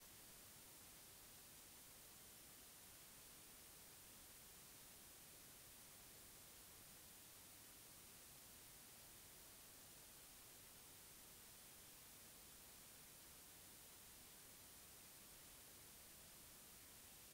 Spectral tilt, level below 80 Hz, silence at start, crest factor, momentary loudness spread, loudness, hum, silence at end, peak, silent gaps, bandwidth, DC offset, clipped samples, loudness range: -1.5 dB/octave; -80 dBFS; 0 s; 14 dB; 0 LU; -60 LUFS; none; 0 s; -50 dBFS; none; 16 kHz; under 0.1%; under 0.1%; 0 LU